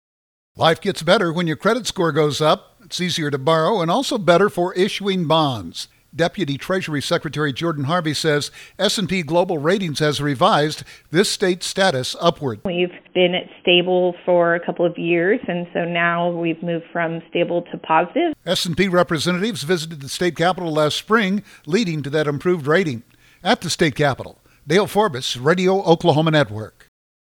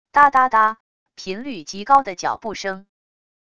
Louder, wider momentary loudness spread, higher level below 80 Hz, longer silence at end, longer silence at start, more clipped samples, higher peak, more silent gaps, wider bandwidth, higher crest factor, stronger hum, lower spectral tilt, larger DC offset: about the same, -19 LUFS vs -18 LUFS; second, 8 LU vs 19 LU; about the same, -54 dBFS vs -58 dBFS; about the same, 0.7 s vs 0.8 s; first, 0.55 s vs 0.15 s; neither; about the same, 0 dBFS vs 0 dBFS; second, none vs 0.80-1.06 s; first, 18.5 kHz vs 10 kHz; about the same, 18 dB vs 20 dB; neither; first, -5 dB/octave vs -3 dB/octave; second, under 0.1% vs 0.5%